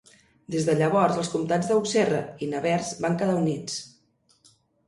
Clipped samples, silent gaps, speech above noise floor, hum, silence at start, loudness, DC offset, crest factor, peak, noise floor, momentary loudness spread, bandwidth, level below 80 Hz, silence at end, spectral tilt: under 0.1%; none; 40 dB; none; 0.5 s; -25 LUFS; under 0.1%; 18 dB; -8 dBFS; -65 dBFS; 10 LU; 11.5 kHz; -64 dBFS; 1 s; -5.5 dB/octave